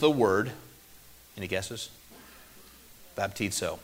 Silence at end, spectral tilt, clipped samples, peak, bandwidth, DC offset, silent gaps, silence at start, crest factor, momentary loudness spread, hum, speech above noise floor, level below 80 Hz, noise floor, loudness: 0 s; -4 dB/octave; under 0.1%; -10 dBFS; 16 kHz; under 0.1%; none; 0 s; 22 dB; 26 LU; none; 25 dB; -60 dBFS; -53 dBFS; -30 LUFS